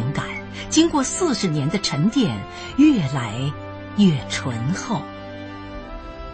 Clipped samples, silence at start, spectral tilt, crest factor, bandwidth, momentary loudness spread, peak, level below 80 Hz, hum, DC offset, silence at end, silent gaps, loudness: under 0.1%; 0 s; -5 dB/octave; 18 dB; 8.8 kHz; 17 LU; -4 dBFS; -44 dBFS; none; under 0.1%; 0 s; none; -21 LUFS